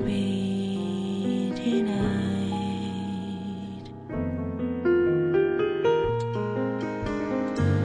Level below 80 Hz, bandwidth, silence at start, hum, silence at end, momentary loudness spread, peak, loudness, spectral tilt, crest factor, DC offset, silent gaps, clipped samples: -48 dBFS; 10 kHz; 0 s; none; 0 s; 9 LU; -12 dBFS; -27 LUFS; -7.5 dB/octave; 14 dB; under 0.1%; none; under 0.1%